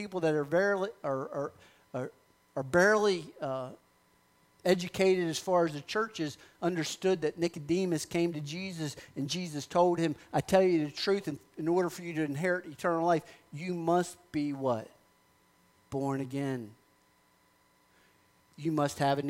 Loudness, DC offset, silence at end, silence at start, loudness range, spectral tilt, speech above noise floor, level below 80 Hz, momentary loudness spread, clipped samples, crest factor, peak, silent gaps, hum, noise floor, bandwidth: -31 LUFS; under 0.1%; 0 s; 0 s; 7 LU; -5.5 dB/octave; 37 dB; -68 dBFS; 12 LU; under 0.1%; 20 dB; -12 dBFS; none; none; -67 dBFS; 16 kHz